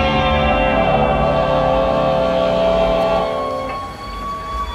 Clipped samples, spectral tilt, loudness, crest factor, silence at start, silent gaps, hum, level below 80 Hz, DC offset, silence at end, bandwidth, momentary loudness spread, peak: under 0.1%; -6.5 dB/octave; -17 LUFS; 14 dB; 0 s; none; none; -28 dBFS; under 0.1%; 0 s; 13 kHz; 10 LU; -2 dBFS